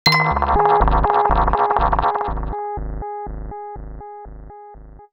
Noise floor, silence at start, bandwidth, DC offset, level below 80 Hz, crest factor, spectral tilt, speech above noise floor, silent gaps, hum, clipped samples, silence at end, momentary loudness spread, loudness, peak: -40 dBFS; 0.05 s; 13.5 kHz; under 0.1%; -26 dBFS; 18 dB; -5.5 dB/octave; 23 dB; none; none; under 0.1%; 0.1 s; 21 LU; -18 LUFS; -2 dBFS